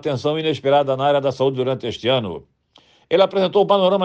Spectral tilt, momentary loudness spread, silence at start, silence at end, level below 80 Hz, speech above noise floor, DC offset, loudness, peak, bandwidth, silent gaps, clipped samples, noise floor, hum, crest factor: -6.5 dB/octave; 7 LU; 0.05 s; 0 s; -62 dBFS; 37 dB; under 0.1%; -19 LUFS; -4 dBFS; 8.2 kHz; none; under 0.1%; -55 dBFS; none; 16 dB